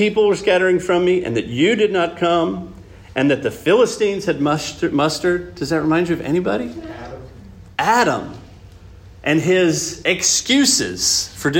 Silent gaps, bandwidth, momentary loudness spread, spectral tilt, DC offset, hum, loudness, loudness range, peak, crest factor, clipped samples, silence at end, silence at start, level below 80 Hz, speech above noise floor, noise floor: none; 16.5 kHz; 12 LU; -3.5 dB/octave; under 0.1%; none; -17 LUFS; 4 LU; -2 dBFS; 16 dB; under 0.1%; 0 s; 0 s; -48 dBFS; 23 dB; -41 dBFS